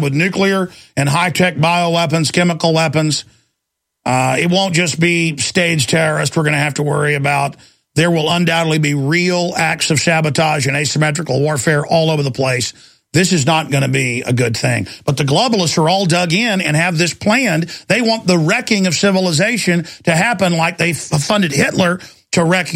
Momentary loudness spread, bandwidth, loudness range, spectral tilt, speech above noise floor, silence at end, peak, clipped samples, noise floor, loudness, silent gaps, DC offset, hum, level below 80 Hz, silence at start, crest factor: 4 LU; 16 kHz; 1 LU; -4.5 dB/octave; 61 dB; 0 s; 0 dBFS; under 0.1%; -75 dBFS; -14 LUFS; none; under 0.1%; none; -52 dBFS; 0 s; 14 dB